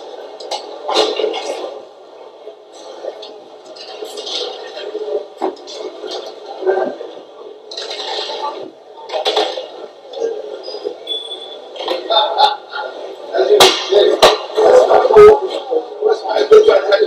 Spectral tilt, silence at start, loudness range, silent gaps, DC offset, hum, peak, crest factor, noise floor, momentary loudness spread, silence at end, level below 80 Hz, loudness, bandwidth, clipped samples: -2 dB/octave; 0 s; 15 LU; none; under 0.1%; none; 0 dBFS; 16 dB; -37 dBFS; 23 LU; 0 s; -50 dBFS; -14 LUFS; 16 kHz; 0.4%